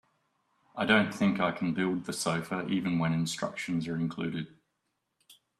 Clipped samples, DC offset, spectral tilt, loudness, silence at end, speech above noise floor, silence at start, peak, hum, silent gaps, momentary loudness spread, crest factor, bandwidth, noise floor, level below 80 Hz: under 0.1%; under 0.1%; -5 dB/octave; -30 LUFS; 0.25 s; 51 dB; 0.75 s; -10 dBFS; none; none; 10 LU; 22 dB; 13.5 kHz; -81 dBFS; -66 dBFS